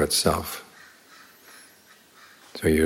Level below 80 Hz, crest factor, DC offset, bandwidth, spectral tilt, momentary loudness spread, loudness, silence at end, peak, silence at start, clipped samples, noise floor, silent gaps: -48 dBFS; 22 dB; under 0.1%; 17 kHz; -3.5 dB/octave; 27 LU; -25 LUFS; 0 s; -6 dBFS; 0 s; under 0.1%; -54 dBFS; none